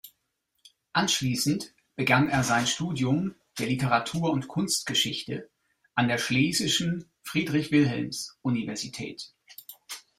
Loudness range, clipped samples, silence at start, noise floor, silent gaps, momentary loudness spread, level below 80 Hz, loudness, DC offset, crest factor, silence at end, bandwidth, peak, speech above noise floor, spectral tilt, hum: 2 LU; under 0.1%; 0.05 s; -77 dBFS; none; 14 LU; -60 dBFS; -27 LUFS; under 0.1%; 22 dB; 0.2 s; 16 kHz; -6 dBFS; 51 dB; -4 dB/octave; none